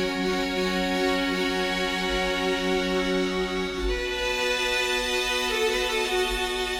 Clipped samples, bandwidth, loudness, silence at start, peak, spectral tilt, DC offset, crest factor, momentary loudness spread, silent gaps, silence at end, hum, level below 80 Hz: under 0.1%; 18.5 kHz; -25 LUFS; 0 s; -12 dBFS; -3.5 dB/octave; under 0.1%; 14 dB; 3 LU; none; 0 s; none; -40 dBFS